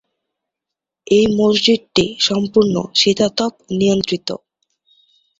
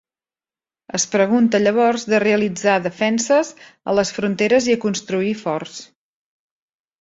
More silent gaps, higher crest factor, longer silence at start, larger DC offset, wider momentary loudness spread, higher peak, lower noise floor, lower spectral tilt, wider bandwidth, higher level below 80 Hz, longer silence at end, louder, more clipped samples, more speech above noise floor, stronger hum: neither; about the same, 18 dB vs 16 dB; first, 1.1 s vs 0.95 s; neither; about the same, 8 LU vs 10 LU; about the same, 0 dBFS vs -2 dBFS; second, -84 dBFS vs under -90 dBFS; about the same, -4.5 dB/octave vs -4 dB/octave; about the same, 8 kHz vs 8 kHz; first, -50 dBFS vs -60 dBFS; second, 1.05 s vs 1.2 s; about the same, -16 LUFS vs -18 LUFS; neither; second, 68 dB vs over 72 dB; neither